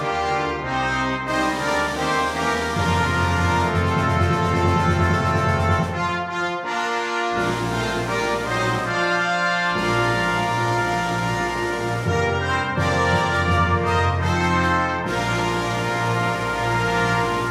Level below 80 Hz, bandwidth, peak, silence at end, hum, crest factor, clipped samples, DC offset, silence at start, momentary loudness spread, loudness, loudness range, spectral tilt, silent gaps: -40 dBFS; 15 kHz; -6 dBFS; 0 s; none; 14 dB; under 0.1%; under 0.1%; 0 s; 4 LU; -21 LUFS; 2 LU; -5.5 dB/octave; none